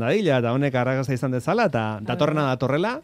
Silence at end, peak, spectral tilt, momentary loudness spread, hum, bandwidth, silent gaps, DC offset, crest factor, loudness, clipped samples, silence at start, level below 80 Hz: 0.05 s; -6 dBFS; -7 dB/octave; 4 LU; none; 14 kHz; none; under 0.1%; 16 dB; -23 LUFS; under 0.1%; 0 s; -58 dBFS